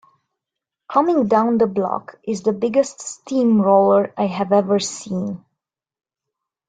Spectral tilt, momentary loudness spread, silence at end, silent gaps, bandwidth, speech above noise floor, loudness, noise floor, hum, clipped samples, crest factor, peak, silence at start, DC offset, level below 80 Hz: -6 dB/octave; 12 LU; 1.3 s; none; 9.4 kHz; 66 dB; -18 LUFS; -84 dBFS; none; under 0.1%; 18 dB; -2 dBFS; 0.9 s; under 0.1%; -64 dBFS